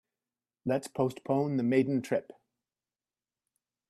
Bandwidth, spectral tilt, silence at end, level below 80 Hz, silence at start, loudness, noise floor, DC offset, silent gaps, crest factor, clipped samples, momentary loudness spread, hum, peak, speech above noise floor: 13.5 kHz; -7.5 dB/octave; 1.7 s; -76 dBFS; 0.65 s; -31 LUFS; under -90 dBFS; under 0.1%; none; 20 dB; under 0.1%; 7 LU; none; -14 dBFS; over 60 dB